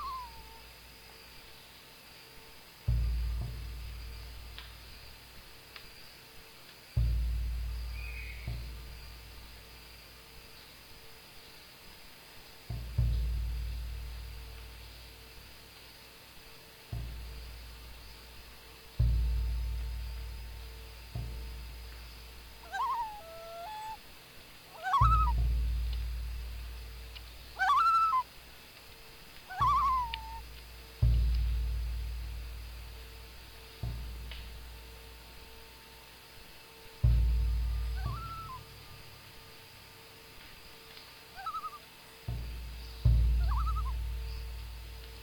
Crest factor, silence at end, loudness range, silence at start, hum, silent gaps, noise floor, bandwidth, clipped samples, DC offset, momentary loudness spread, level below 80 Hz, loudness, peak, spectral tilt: 22 dB; 0 s; 15 LU; 0 s; none; none; -54 dBFS; 19 kHz; under 0.1%; under 0.1%; 21 LU; -38 dBFS; -35 LUFS; -14 dBFS; -5 dB/octave